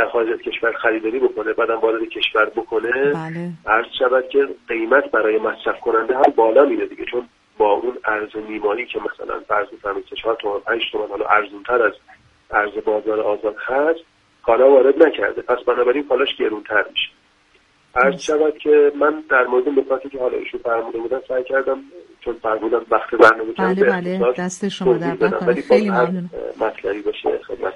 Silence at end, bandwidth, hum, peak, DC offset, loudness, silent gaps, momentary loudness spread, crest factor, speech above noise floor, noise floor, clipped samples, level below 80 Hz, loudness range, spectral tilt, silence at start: 0 s; 10.5 kHz; none; 0 dBFS; under 0.1%; -19 LUFS; none; 10 LU; 18 dB; 38 dB; -56 dBFS; under 0.1%; -54 dBFS; 5 LU; -5.5 dB/octave; 0 s